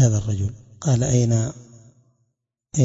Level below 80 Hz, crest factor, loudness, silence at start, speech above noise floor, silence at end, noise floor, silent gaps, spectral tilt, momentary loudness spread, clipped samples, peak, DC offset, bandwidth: -46 dBFS; 18 dB; -22 LUFS; 0 s; 55 dB; 0 s; -75 dBFS; none; -6.5 dB/octave; 11 LU; under 0.1%; -4 dBFS; under 0.1%; 7.8 kHz